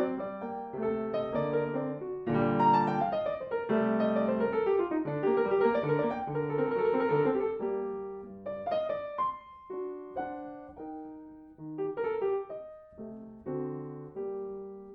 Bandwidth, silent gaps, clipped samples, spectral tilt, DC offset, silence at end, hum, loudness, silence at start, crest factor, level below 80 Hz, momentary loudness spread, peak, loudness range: 5.8 kHz; none; under 0.1%; -9.5 dB/octave; under 0.1%; 0 s; none; -31 LUFS; 0 s; 18 dB; -64 dBFS; 16 LU; -14 dBFS; 9 LU